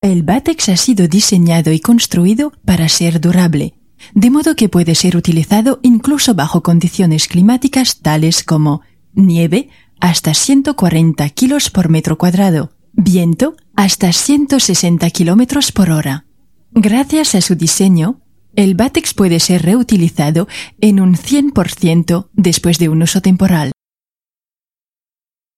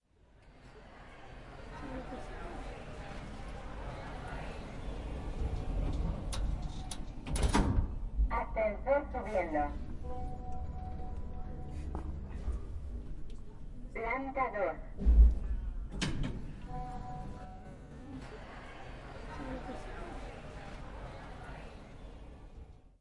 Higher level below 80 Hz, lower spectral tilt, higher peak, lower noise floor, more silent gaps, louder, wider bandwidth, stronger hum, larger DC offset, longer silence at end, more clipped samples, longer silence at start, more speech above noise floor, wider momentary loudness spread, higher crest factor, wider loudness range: about the same, -40 dBFS vs -38 dBFS; about the same, -5 dB/octave vs -6 dB/octave; first, 0 dBFS vs -12 dBFS; first, under -90 dBFS vs -61 dBFS; neither; first, -11 LUFS vs -38 LUFS; first, 15.5 kHz vs 11.5 kHz; neither; first, 0.3% vs under 0.1%; first, 1.85 s vs 0.15 s; neither; second, 0.05 s vs 0.35 s; first, over 79 dB vs 27 dB; second, 5 LU vs 18 LU; second, 12 dB vs 24 dB; second, 2 LU vs 13 LU